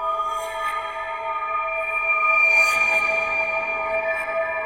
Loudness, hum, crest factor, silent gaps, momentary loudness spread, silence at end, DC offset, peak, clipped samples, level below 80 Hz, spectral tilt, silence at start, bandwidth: -20 LUFS; none; 16 dB; none; 12 LU; 0 s; under 0.1%; -6 dBFS; under 0.1%; -54 dBFS; -1 dB/octave; 0 s; 16 kHz